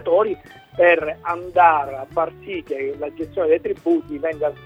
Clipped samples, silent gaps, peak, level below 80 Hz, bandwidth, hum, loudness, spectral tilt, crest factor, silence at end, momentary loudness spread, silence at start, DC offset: under 0.1%; none; 0 dBFS; -54 dBFS; 5.2 kHz; none; -20 LUFS; -7 dB/octave; 20 dB; 0 s; 12 LU; 0 s; under 0.1%